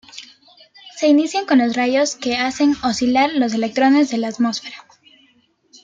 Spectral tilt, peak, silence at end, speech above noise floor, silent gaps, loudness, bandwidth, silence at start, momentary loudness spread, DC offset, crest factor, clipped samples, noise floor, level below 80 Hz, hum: -3.5 dB/octave; -4 dBFS; 1 s; 41 dB; none; -17 LUFS; 9 kHz; 0.15 s; 11 LU; under 0.1%; 16 dB; under 0.1%; -58 dBFS; -58 dBFS; none